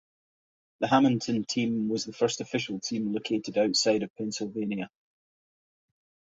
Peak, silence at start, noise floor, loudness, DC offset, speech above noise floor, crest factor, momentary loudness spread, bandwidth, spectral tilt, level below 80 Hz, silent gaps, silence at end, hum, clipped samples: -8 dBFS; 0.8 s; under -90 dBFS; -28 LUFS; under 0.1%; over 62 dB; 22 dB; 10 LU; 8 kHz; -4.5 dB/octave; -68 dBFS; 4.10-4.14 s; 1.45 s; none; under 0.1%